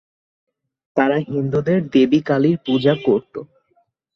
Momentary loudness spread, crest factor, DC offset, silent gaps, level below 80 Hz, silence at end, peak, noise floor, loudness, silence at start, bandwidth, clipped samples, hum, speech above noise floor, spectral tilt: 7 LU; 16 dB; under 0.1%; none; -58 dBFS; 0.7 s; -2 dBFS; -64 dBFS; -18 LUFS; 0.95 s; 6.4 kHz; under 0.1%; none; 47 dB; -8 dB/octave